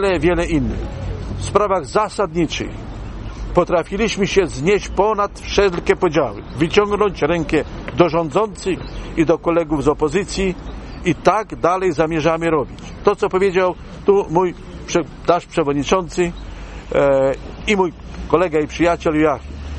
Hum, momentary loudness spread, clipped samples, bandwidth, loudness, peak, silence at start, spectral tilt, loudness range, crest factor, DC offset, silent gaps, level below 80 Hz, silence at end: none; 10 LU; under 0.1%; 10.5 kHz; -18 LUFS; 0 dBFS; 0 s; -5.5 dB/octave; 2 LU; 18 dB; under 0.1%; none; -34 dBFS; 0 s